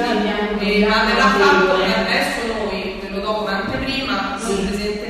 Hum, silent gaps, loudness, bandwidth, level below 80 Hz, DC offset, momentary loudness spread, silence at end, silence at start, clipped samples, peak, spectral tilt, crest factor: none; none; -18 LUFS; 13.5 kHz; -38 dBFS; under 0.1%; 10 LU; 0 s; 0 s; under 0.1%; 0 dBFS; -4.5 dB/octave; 18 dB